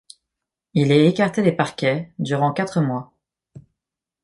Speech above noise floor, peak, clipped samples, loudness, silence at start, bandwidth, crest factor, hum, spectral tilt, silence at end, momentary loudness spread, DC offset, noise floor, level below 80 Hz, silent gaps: 66 dB; -2 dBFS; under 0.1%; -20 LUFS; 0.75 s; 11.5 kHz; 18 dB; none; -7 dB/octave; 0.65 s; 10 LU; under 0.1%; -85 dBFS; -62 dBFS; none